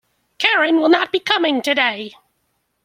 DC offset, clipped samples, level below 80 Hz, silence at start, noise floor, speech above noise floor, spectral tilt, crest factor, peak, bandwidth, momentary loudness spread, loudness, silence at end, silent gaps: under 0.1%; under 0.1%; -70 dBFS; 0.4 s; -69 dBFS; 52 dB; -2.5 dB/octave; 18 dB; 0 dBFS; 15.5 kHz; 6 LU; -16 LUFS; 0.75 s; none